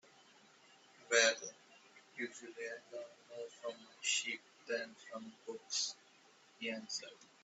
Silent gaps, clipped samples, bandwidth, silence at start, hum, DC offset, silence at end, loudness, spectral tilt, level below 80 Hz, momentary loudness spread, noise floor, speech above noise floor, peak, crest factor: none; under 0.1%; 8.2 kHz; 1 s; none; under 0.1%; 0.2 s; -39 LUFS; 0.5 dB/octave; under -90 dBFS; 18 LU; -66 dBFS; 25 dB; -18 dBFS; 26 dB